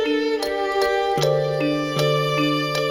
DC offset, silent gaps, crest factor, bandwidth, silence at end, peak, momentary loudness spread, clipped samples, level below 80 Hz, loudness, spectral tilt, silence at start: under 0.1%; none; 14 dB; 16.5 kHz; 0 s; -8 dBFS; 2 LU; under 0.1%; -52 dBFS; -21 LUFS; -5 dB/octave; 0 s